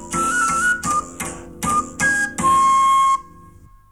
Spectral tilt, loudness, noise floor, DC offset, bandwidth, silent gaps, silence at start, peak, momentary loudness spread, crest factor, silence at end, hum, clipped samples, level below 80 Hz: -2.5 dB/octave; -17 LUFS; -46 dBFS; 0.3%; 16.5 kHz; none; 0 s; -8 dBFS; 12 LU; 12 dB; 0.7 s; 50 Hz at -50 dBFS; under 0.1%; -44 dBFS